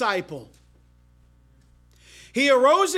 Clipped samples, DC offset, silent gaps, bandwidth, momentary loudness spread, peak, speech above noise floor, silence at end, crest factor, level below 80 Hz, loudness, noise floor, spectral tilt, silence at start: under 0.1%; under 0.1%; none; 15 kHz; 22 LU; -6 dBFS; 36 dB; 0 s; 18 dB; -58 dBFS; -20 LUFS; -56 dBFS; -3 dB/octave; 0 s